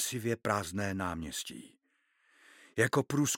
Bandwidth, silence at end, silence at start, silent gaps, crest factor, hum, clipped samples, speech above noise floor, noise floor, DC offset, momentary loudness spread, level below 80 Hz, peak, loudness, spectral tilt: 17 kHz; 0 s; 0 s; none; 22 dB; none; under 0.1%; 42 dB; -75 dBFS; under 0.1%; 11 LU; -62 dBFS; -12 dBFS; -33 LUFS; -4 dB/octave